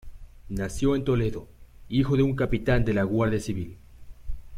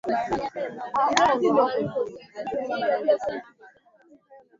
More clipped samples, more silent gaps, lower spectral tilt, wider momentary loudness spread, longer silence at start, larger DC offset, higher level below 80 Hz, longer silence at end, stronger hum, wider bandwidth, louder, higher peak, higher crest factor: neither; neither; first, -7 dB/octave vs -4 dB/octave; first, 17 LU vs 13 LU; about the same, 0.05 s vs 0.05 s; neither; first, -38 dBFS vs -60 dBFS; second, 0 s vs 0.2 s; neither; first, 15 kHz vs 7.6 kHz; about the same, -26 LUFS vs -25 LUFS; second, -10 dBFS vs -2 dBFS; second, 16 dB vs 24 dB